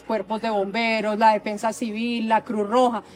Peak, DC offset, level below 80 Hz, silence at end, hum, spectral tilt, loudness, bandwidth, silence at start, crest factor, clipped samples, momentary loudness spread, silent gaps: -6 dBFS; under 0.1%; -64 dBFS; 0 s; none; -4.5 dB/octave; -22 LUFS; 16 kHz; 0.05 s; 16 dB; under 0.1%; 7 LU; none